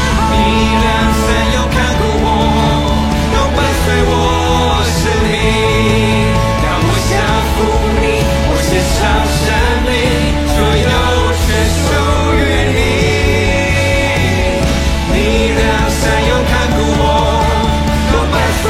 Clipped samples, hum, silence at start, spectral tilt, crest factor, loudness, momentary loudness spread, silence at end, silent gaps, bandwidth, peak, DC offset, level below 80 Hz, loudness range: under 0.1%; none; 0 s; -5 dB/octave; 12 dB; -12 LUFS; 2 LU; 0 s; none; 16 kHz; 0 dBFS; under 0.1%; -18 dBFS; 1 LU